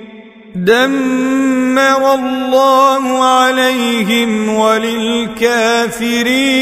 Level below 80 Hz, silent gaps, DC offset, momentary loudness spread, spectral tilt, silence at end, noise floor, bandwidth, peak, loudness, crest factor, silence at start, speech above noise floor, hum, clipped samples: -50 dBFS; none; under 0.1%; 5 LU; -3.5 dB/octave; 0 s; -35 dBFS; 16 kHz; 0 dBFS; -12 LUFS; 12 dB; 0 s; 23 dB; none; under 0.1%